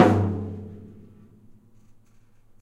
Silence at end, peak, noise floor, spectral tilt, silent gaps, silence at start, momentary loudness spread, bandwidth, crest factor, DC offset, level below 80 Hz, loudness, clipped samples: 1.75 s; -2 dBFS; -54 dBFS; -8 dB/octave; none; 0 s; 26 LU; 11 kHz; 26 dB; under 0.1%; -56 dBFS; -25 LUFS; under 0.1%